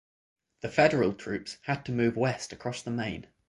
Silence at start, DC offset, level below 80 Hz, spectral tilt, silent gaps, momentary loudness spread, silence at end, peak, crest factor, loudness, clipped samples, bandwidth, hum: 0.65 s; under 0.1%; -60 dBFS; -6 dB/octave; none; 12 LU; 0.25 s; -8 dBFS; 22 dB; -29 LUFS; under 0.1%; 11.5 kHz; none